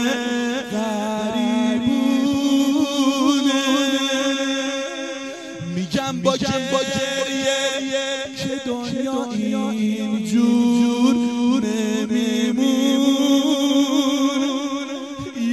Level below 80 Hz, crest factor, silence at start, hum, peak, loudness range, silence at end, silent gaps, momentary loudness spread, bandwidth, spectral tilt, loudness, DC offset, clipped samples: -60 dBFS; 16 dB; 0 s; none; -4 dBFS; 4 LU; 0 s; none; 8 LU; 13.5 kHz; -4 dB/octave; -20 LUFS; under 0.1%; under 0.1%